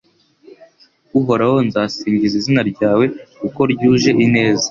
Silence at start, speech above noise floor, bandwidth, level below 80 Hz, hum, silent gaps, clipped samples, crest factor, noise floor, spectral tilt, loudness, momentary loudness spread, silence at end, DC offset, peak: 1.15 s; 36 dB; 7.4 kHz; -50 dBFS; none; none; under 0.1%; 14 dB; -51 dBFS; -5.5 dB/octave; -15 LUFS; 7 LU; 0 s; under 0.1%; -2 dBFS